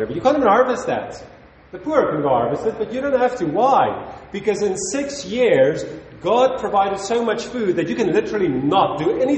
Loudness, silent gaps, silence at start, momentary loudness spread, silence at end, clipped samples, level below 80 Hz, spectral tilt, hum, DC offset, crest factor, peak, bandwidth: -19 LUFS; none; 0 s; 11 LU; 0 s; under 0.1%; -52 dBFS; -5 dB/octave; none; under 0.1%; 16 dB; -4 dBFS; 8.8 kHz